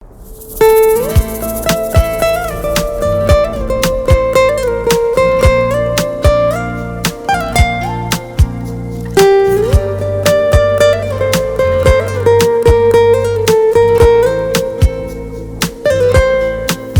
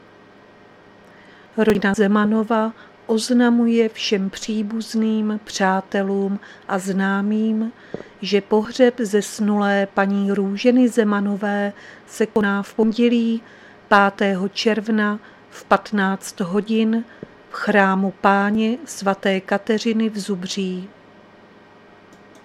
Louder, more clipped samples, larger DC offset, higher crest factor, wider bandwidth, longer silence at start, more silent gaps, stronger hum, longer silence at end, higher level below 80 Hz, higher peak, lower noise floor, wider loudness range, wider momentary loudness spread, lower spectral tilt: first, -12 LUFS vs -20 LUFS; neither; neither; second, 12 dB vs 20 dB; first, over 20 kHz vs 13.5 kHz; second, 0 s vs 1.55 s; neither; neither; second, 0 s vs 1.55 s; first, -22 dBFS vs -60 dBFS; about the same, 0 dBFS vs 0 dBFS; second, -32 dBFS vs -47 dBFS; about the same, 4 LU vs 3 LU; about the same, 9 LU vs 10 LU; about the same, -5 dB/octave vs -5.5 dB/octave